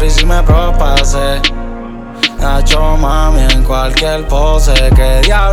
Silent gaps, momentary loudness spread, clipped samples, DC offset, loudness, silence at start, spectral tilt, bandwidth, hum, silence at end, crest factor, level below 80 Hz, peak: none; 5 LU; under 0.1%; under 0.1%; -12 LUFS; 0 s; -4.5 dB/octave; 13.5 kHz; none; 0 s; 8 dB; -10 dBFS; 0 dBFS